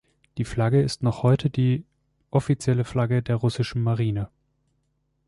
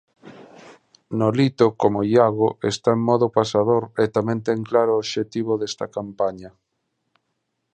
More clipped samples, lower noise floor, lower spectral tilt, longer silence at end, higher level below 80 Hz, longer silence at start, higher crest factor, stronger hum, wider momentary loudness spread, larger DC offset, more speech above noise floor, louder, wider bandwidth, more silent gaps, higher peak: neither; about the same, -72 dBFS vs -75 dBFS; about the same, -7.5 dB/octave vs -6.5 dB/octave; second, 1 s vs 1.25 s; first, -50 dBFS vs -60 dBFS; about the same, 0.35 s vs 0.25 s; about the same, 16 dB vs 20 dB; neither; about the same, 8 LU vs 8 LU; neither; second, 49 dB vs 55 dB; second, -24 LUFS vs -21 LUFS; first, 11.5 kHz vs 9.4 kHz; neither; second, -8 dBFS vs -2 dBFS